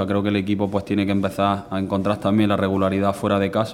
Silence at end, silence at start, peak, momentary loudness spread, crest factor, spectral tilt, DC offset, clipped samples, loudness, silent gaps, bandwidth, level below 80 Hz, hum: 0 s; 0 s; -4 dBFS; 3 LU; 16 dB; -7 dB/octave; under 0.1%; under 0.1%; -21 LUFS; none; 15 kHz; -54 dBFS; none